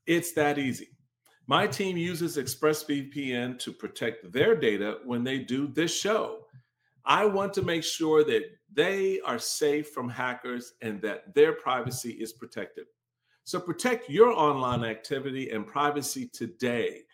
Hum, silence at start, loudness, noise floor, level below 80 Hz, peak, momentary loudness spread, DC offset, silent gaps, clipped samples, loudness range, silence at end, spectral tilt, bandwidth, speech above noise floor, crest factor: none; 0.05 s; -28 LUFS; -75 dBFS; -66 dBFS; -6 dBFS; 13 LU; under 0.1%; none; under 0.1%; 3 LU; 0.1 s; -4 dB/octave; 17 kHz; 47 dB; 22 dB